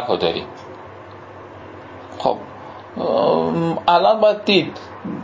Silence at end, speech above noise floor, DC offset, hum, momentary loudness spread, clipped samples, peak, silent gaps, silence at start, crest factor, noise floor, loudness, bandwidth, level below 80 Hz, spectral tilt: 0 s; 20 dB; under 0.1%; none; 23 LU; under 0.1%; -2 dBFS; none; 0 s; 18 dB; -38 dBFS; -18 LUFS; 7.8 kHz; -54 dBFS; -6.5 dB/octave